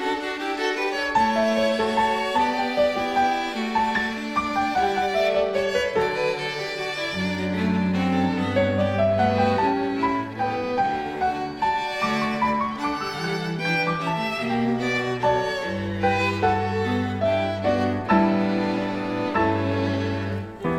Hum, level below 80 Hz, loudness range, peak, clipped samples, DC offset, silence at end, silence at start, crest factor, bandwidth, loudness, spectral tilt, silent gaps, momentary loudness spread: none; -50 dBFS; 2 LU; -6 dBFS; under 0.1%; under 0.1%; 0 s; 0 s; 16 dB; 15.5 kHz; -23 LUFS; -6 dB/octave; none; 6 LU